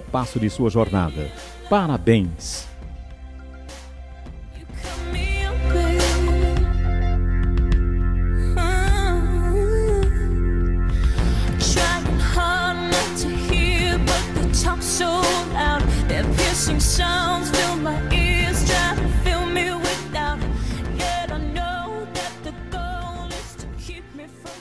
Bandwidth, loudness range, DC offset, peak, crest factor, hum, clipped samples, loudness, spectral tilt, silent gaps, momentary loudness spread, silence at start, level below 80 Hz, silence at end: 11 kHz; 7 LU; 0.9%; -4 dBFS; 18 dB; none; under 0.1%; -21 LUFS; -4.5 dB/octave; none; 17 LU; 0 s; -24 dBFS; 0 s